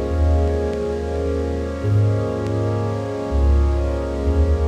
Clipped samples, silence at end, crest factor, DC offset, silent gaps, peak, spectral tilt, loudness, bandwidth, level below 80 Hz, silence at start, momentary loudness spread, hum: under 0.1%; 0 s; 12 dB; under 0.1%; none; -8 dBFS; -8.5 dB/octave; -21 LUFS; 8.6 kHz; -22 dBFS; 0 s; 5 LU; none